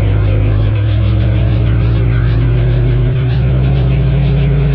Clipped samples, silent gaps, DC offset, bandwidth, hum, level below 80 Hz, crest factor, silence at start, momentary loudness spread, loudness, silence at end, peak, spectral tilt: under 0.1%; none; under 0.1%; 4.8 kHz; none; -16 dBFS; 6 dB; 0 s; 1 LU; -12 LUFS; 0 s; -4 dBFS; -11 dB/octave